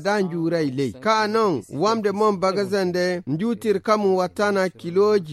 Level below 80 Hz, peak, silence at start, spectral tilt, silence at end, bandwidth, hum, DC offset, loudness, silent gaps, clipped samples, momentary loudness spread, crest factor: -64 dBFS; -4 dBFS; 0 s; -6 dB/octave; 0 s; 13.5 kHz; none; under 0.1%; -22 LUFS; none; under 0.1%; 4 LU; 16 dB